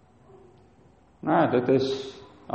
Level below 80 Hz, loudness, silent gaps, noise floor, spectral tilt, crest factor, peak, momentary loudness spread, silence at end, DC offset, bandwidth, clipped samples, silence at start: -64 dBFS; -25 LUFS; none; -57 dBFS; -7 dB/octave; 18 dB; -10 dBFS; 18 LU; 0 s; under 0.1%; 8.4 kHz; under 0.1%; 1.25 s